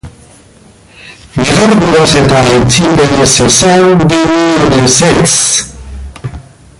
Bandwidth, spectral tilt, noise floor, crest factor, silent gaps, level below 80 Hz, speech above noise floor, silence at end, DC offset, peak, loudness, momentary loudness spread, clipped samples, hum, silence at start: 16 kHz; -4 dB/octave; -39 dBFS; 8 dB; none; -30 dBFS; 32 dB; 0.4 s; under 0.1%; 0 dBFS; -7 LUFS; 18 LU; 0.1%; none; 0.05 s